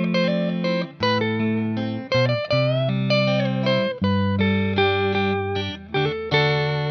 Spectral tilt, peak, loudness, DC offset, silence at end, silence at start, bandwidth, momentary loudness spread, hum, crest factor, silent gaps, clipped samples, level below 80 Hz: -7 dB/octave; -6 dBFS; -22 LUFS; under 0.1%; 0 s; 0 s; 6.4 kHz; 5 LU; none; 14 dB; none; under 0.1%; -56 dBFS